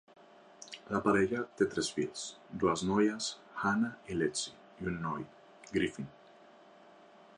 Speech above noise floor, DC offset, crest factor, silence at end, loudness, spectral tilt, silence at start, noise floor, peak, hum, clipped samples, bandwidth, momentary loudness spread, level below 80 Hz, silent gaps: 25 dB; under 0.1%; 20 dB; 1.25 s; -34 LUFS; -4.5 dB/octave; 0.6 s; -58 dBFS; -16 dBFS; none; under 0.1%; 11 kHz; 14 LU; -62 dBFS; none